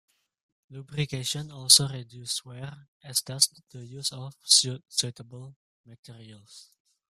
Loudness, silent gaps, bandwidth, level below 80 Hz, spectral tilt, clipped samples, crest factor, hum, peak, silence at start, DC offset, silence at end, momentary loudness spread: -24 LUFS; 2.88-3.00 s, 5.56-5.84 s, 5.99-6.03 s; 15.5 kHz; -66 dBFS; -1.5 dB/octave; under 0.1%; 28 dB; none; -2 dBFS; 0.7 s; under 0.1%; 0.5 s; 26 LU